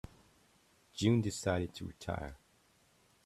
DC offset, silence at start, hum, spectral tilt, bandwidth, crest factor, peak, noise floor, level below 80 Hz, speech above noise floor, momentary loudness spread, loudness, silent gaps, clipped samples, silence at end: under 0.1%; 0.95 s; none; -6 dB/octave; 13.5 kHz; 22 dB; -16 dBFS; -70 dBFS; -60 dBFS; 35 dB; 18 LU; -36 LUFS; none; under 0.1%; 0.9 s